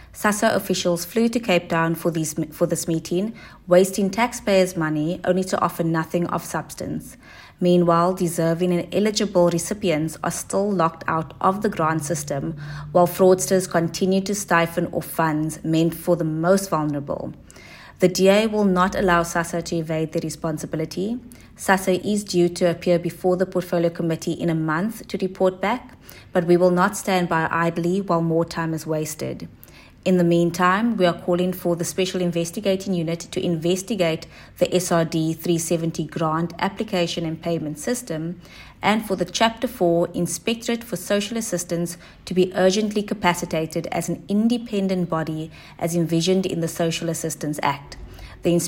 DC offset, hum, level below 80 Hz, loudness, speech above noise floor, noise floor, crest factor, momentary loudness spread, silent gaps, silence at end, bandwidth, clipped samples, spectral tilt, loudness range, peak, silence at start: under 0.1%; none; -50 dBFS; -22 LUFS; 22 dB; -43 dBFS; 20 dB; 9 LU; none; 0 s; 16.5 kHz; under 0.1%; -5 dB/octave; 3 LU; -2 dBFS; 0 s